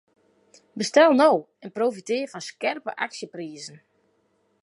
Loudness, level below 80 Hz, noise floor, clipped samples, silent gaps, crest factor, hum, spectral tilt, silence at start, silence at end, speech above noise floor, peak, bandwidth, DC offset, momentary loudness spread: -23 LUFS; -82 dBFS; -68 dBFS; under 0.1%; none; 20 dB; none; -4 dB/octave; 0.75 s; 0.95 s; 45 dB; -4 dBFS; 11.5 kHz; under 0.1%; 21 LU